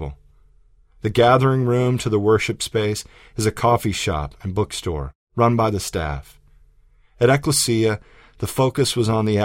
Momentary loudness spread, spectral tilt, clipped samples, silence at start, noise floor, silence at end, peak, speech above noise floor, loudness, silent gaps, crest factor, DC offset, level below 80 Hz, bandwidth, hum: 13 LU; -5 dB/octave; under 0.1%; 0 s; -54 dBFS; 0 s; -2 dBFS; 34 dB; -20 LUFS; 5.15-5.27 s; 18 dB; under 0.1%; -40 dBFS; 16 kHz; none